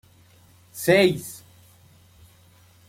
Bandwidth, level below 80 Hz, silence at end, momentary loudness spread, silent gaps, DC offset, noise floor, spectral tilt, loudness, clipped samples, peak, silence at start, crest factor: 16.5 kHz; -62 dBFS; 1.5 s; 24 LU; none; under 0.1%; -55 dBFS; -5 dB/octave; -21 LUFS; under 0.1%; -6 dBFS; 0.75 s; 20 dB